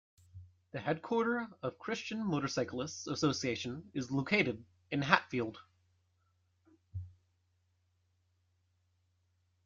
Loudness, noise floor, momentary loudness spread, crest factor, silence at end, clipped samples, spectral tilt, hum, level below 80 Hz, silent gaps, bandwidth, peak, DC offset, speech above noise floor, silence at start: -35 LUFS; -76 dBFS; 17 LU; 28 dB; 2.55 s; under 0.1%; -5 dB/octave; none; -72 dBFS; none; 7.6 kHz; -10 dBFS; under 0.1%; 41 dB; 0.35 s